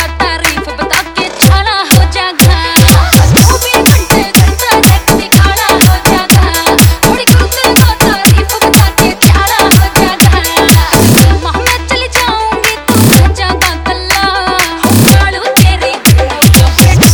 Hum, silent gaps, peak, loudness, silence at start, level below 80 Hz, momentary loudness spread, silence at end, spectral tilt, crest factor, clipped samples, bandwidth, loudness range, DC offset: none; none; 0 dBFS; -7 LUFS; 0 s; -14 dBFS; 6 LU; 0 s; -4 dB/octave; 6 dB; 4%; over 20 kHz; 2 LU; under 0.1%